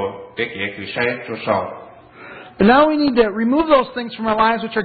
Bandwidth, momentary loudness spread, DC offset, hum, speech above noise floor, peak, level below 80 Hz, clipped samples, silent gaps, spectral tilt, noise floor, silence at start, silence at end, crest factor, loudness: 4.8 kHz; 16 LU; under 0.1%; none; 22 dB; -2 dBFS; -48 dBFS; under 0.1%; none; -11 dB/octave; -39 dBFS; 0 s; 0 s; 16 dB; -17 LUFS